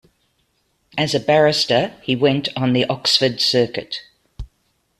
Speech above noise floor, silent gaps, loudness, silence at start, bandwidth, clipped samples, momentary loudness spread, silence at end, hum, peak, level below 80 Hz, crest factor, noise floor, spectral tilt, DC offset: 48 dB; none; -17 LUFS; 0.95 s; 14.5 kHz; under 0.1%; 15 LU; 0.55 s; none; -2 dBFS; -48 dBFS; 18 dB; -66 dBFS; -4.5 dB/octave; under 0.1%